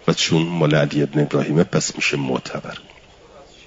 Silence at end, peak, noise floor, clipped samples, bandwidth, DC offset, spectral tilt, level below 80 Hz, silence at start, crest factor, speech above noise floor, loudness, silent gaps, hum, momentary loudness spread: 0.25 s; -2 dBFS; -46 dBFS; under 0.1%; 7.8 kHz; under 0.1%; -5 dB/octave; -54 dBFS; 0.05 s; 18 dB; 26 dB; -19 LUFS; none; none; 13 LU